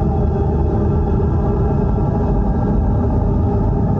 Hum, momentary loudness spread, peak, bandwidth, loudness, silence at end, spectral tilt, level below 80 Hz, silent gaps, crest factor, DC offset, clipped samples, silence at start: none; 1 LU; -6 dBFS; 3.6 kHz; -17 LUFS; 0 s; -11.5 dB/octave; -20 dBFS; none; 10 dB; under 0.1%; under 0.1%; 0 s